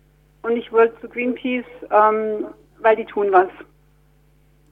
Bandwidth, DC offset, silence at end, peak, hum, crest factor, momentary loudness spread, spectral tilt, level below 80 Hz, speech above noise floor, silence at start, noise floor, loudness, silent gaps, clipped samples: 3.9 kHz; under 0.1%; 1.1 s; -2 dBFS; none; 18 dB; 10 LU; -7 dB/octave; -58 dBFS; 37 dB; 0.45 s; -56 dBFS; -19 LUFS; none; under 0.1%